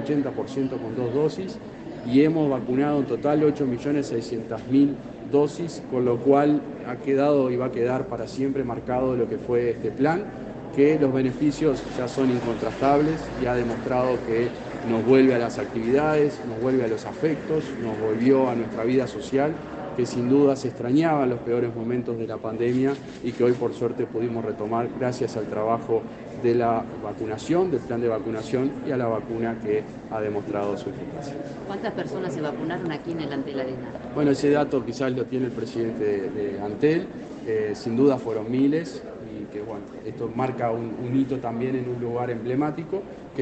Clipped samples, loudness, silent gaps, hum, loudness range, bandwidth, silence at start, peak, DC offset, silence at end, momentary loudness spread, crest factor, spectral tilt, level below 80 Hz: under 0.1%; -25 LUFS; none; none; 5 LU; 8.6 kHz; 0 s; -6 dBFS; under 0.1%; 0 s; 11 LU; 18 dB; -7.5 dB/octave; -54 dBFS